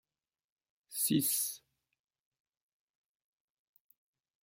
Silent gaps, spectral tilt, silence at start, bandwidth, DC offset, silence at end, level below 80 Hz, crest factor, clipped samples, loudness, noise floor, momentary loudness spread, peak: none; -3 dB/octave; 0.9 s; 16.5 kHz; under 0.1%; 2.85 s; -80 dBFS; 24 dB; under 0.1%; -32 LUFS; under -90 dBFS; 15 LU; -18 dBFS